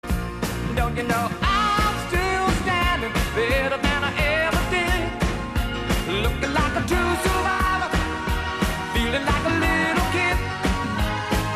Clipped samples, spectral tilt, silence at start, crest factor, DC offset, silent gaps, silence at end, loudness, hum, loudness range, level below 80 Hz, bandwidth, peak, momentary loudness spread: under 0.1%; -4.5 dB/octave; 0.05 s; 16 dB; 0.1%; none; 0 s; -22 LUFS; none; 1 LU; -30 dBFS; 14.5 kHz; -6 dBFS; 5 LU